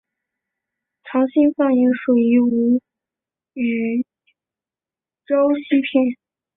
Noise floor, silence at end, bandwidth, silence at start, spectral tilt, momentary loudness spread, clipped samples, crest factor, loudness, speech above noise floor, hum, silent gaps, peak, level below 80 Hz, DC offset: under -90 dBFS; 0.4 s; 3.9 kHz; 1.05 s; -10.5 dB/octave; 9 LU; under 0.1%; 16 dB; -18 LUFS; over 73 dB; none; none; -4 dBFS; -64 dBFS; under 0.1%